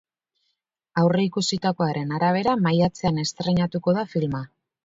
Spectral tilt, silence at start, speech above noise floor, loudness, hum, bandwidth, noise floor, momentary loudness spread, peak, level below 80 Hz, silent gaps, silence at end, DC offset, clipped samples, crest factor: -6 dB/octave; 0.95 s; 54 dB; -23 LUFS; none; 7.8 kHz; -77 dBFS; 6 LU; -8 dBFS; -54 dBFS; none; 0.4 s; under 0.1%; under 0.1%; 16 dB